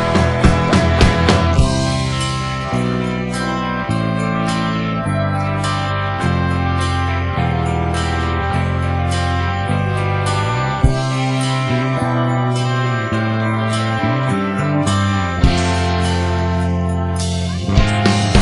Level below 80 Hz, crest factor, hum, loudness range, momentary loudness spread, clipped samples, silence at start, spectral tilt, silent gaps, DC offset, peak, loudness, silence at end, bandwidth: -28 dBFS; 16 dB; none; 2 LU; 5 LU; under 0.1%; 0 s; -6 dB/octave; none; under 0.1%; 0 dBFS; -17 LUFS; 0 s; 11.5 kHz